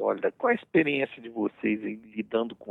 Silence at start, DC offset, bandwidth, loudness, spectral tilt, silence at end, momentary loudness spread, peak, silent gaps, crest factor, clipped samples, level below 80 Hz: 0 s; under 0.1%; 4.1 kHz; -28 LUFS; -8.5 dB/octave; 0 s; 9 LU; -10 dBFS; none; 18 dB; under 0.1%; -72 dBFS